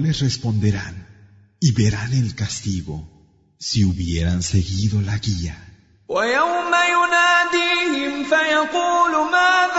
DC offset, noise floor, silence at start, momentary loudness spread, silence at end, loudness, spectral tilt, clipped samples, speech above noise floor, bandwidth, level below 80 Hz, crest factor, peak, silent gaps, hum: under 0.1%; -49 dBFS; 0 s; 11 LU; 0 s; -19 LUFS; -4.5 dB/octave; under 0.1%; 30 dB; 8 kHz; -40 dBFS; 14 dB; -4 dBFS; none; none